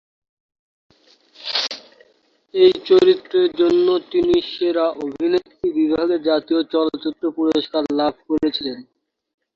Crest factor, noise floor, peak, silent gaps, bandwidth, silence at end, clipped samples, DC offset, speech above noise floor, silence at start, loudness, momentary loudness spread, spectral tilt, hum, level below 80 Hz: 18 dB; -60 dBFS; -2 dBFS; none; 7 kHz; 0.75 s; under 0.1%; under 0.1%; 42 dB; 1.4 s; -19 LUFS; 10 LU; -5 dB/octave; none; -58 dBFS